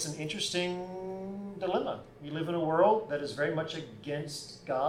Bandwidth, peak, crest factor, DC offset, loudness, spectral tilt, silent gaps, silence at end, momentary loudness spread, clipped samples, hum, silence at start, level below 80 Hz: 16 kHz; -14 dBFS; 20 dB; under 0.1%; -33 LUFS; -4.5 dB/octave; none; 0 s; 14 LU; under 0.1%; none; 0 s; -66 dBFS